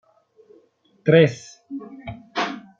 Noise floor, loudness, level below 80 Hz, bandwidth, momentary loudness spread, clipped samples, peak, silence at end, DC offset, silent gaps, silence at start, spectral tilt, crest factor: -58 dBFS; -20 LUFS; -60 dBFS; 7.6 kHz; 22 LU; under 0.1%; -2 dBFS; 0.2 s; under 0.1%; none; 1.05 s; -6.5 dB/octave; 22 dB